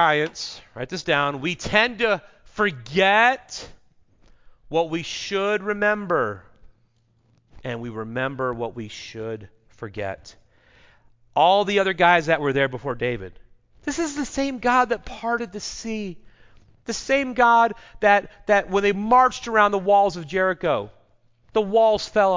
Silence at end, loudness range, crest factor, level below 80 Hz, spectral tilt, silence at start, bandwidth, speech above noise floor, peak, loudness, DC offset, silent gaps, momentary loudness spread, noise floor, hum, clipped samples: 0 s; 11 LU; 20 dB; -52 dBFS; -4 dB/octave; 0 s; 7.6 kHz; 41 dB; -4 dBFS; -22 LUFS; under 0.1%; none; 16 LU; -63 dBFS; none; under 0.1%